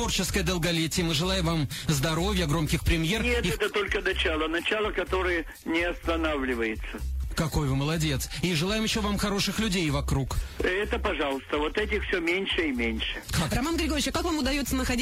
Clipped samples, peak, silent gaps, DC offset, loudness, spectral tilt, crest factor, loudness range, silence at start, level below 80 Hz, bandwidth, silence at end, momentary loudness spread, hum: under 0.1%; -12 dBFS; none; under 0.1%; -27 LUFS; -4.5 dB/octave; 14 dB; 2 LU; 0 s; -36 dBFS; 16 kHz; 0 s; 3 LU; none